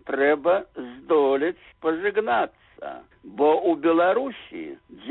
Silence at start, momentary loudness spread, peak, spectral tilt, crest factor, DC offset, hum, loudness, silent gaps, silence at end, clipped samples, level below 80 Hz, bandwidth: 0.05 s; 18 LU; -8 dBFS; -9.5 dB/octave; 14 dB; under 0.1%; none; -23 LUFS; none; 0 s; under 0.1%; -64 dBFS; 4.1 kHz